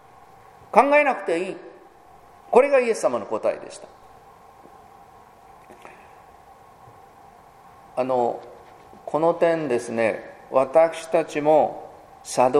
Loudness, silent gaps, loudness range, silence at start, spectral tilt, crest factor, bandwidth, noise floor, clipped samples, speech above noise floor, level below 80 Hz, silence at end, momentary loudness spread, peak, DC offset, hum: -21 LUFS; none; 10 LU; 0.75 s; -5 dB/octave; 24 dB; 13.5 kHz; -50 dBFS; under 0.1%; 29 dB; -64 dBFS; 0 s; 19 LU; 0 dBFS; under 0.1%; none